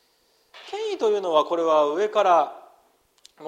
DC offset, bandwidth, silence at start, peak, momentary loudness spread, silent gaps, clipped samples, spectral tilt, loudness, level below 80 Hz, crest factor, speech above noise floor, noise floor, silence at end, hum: under 0.1%; 9.6 kHz; 0.55 s; -4 dBFS; 11 LU; none; under 0.1%; -3.5 dB/octave; -22 LUFS; -78 dBFS; 18 dB; 44 dB; -64 dBFS; 0 s; none